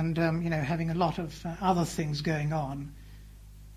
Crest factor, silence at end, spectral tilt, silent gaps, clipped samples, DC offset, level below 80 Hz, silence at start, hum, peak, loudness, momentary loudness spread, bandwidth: 18 dB; 0 s; -6.5 dB/octave; none; under 0.1%; under 0.1%; -48 dBFS; 0 s; 50 Hz at -45 dBFS; -12 dBFS; -30 LUFS; 13 LU; 15 kHz